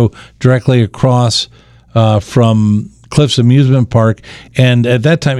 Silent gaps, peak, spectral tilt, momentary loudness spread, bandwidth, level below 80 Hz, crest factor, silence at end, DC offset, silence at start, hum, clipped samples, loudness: none; 0 dBFS; -6.5 dB/octave; 8 LU; 11 kHz; -40 dBFS; 10 dB; 0 s; under 0.1%; 0 s; none; 0.1%; -11 LUFS